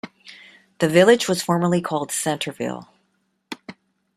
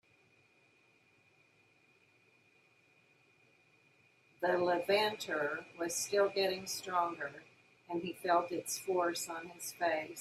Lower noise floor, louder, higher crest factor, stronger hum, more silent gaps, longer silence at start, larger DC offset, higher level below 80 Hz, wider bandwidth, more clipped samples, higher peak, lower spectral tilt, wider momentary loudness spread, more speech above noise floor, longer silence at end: about the same, -69 dBFS vs -69 dBFS; first, -20 LUFS vs -35 LUFS; about the same, 20 dB vs 20 dB; neither; neither; second, 0.05 s vs 4.4 s; neither; first, -64 dBFS vs -84 dBFS; about the same, 15 kHz vs 15.5 kHz; neither; first, -2 dBFS vs -18 dBFS; first, -4.5 dB/octave vs -2.5 dB/octave; first, 22 LU vs 11 LU; first, 50 dB vs 34 dB; first, 0.45 s vs 0 s